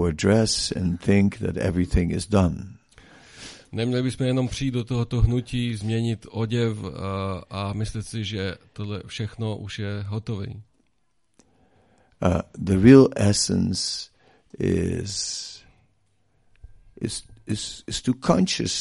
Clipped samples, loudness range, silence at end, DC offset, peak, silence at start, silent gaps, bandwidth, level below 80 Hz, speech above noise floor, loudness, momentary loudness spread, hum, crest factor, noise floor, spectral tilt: under 0.1%; 11 LU; 0 s; under 0.1%; 0 dBFS; 0 s; none; 11.5 kHz; -40 dBFS; 50 dB; -24 LUFS; 13 LU; none; 24 dB; -73 dBFS; -5.5 dB/octave